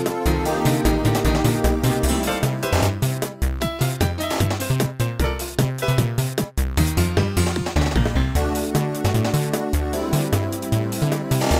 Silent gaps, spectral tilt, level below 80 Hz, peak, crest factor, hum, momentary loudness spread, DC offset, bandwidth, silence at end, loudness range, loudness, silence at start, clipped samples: none; -5.5 dB/octave; -28 dBFS; -4 dBFS; 16 dB; none; 4 LU; under 0.1%; 16 kHz; 0 s; 2 LU; -21 LUFS; 0 s; under 0.1%